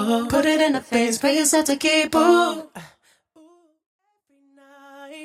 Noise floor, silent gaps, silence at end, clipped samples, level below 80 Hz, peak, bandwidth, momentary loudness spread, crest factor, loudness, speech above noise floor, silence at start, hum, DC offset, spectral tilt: -63 dBFS; 3.86-3.99 s; 0 s; under 0.1%; -58 dBFS; -4 dBFS; 16 kHz; 10 LU; 18 dB; -19 LUFS; 44 dB; 0 s; none; under 0.1%; -2.5 dB/octave